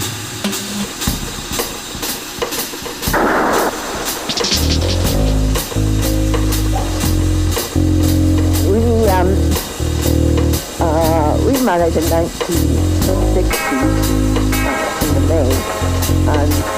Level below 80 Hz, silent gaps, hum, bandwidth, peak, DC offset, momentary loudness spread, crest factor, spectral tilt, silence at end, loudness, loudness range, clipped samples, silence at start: -22 dBFS; none; none; 15.5 kHz; -2 dBFS; under 0.1%; 7 LU; 14 dB; -5 dB/octave; 0 s; -16 LUFS; 3 LU; under 0.1%; 0 s